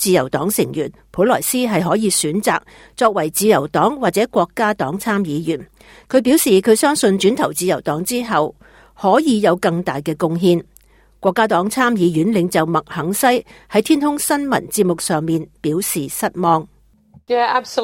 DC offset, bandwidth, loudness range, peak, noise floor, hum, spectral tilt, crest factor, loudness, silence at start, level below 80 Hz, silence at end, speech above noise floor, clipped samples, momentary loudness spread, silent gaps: under 0.1%; 17 kHz; 2 LU; -2 dBFS; -50 dBFS; none; -4.5 dB/octave; 16 dB; -17 LUFS; 0 s; -52 dBFS; 0 s; 34 dB; under 0.1%; 7 LU; none